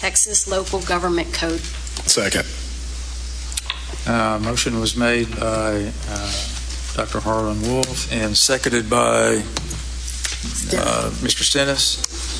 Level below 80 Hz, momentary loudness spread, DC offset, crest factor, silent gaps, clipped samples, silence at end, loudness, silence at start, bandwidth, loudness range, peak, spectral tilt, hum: -30 dBFS; 12 LU; under 0.1%; 20 dB; none; under 0.1%; 0 s; -20 LUFS; 0 s; 11 kHz; 3 LU; 0 dBFS; -3 dB/octave; none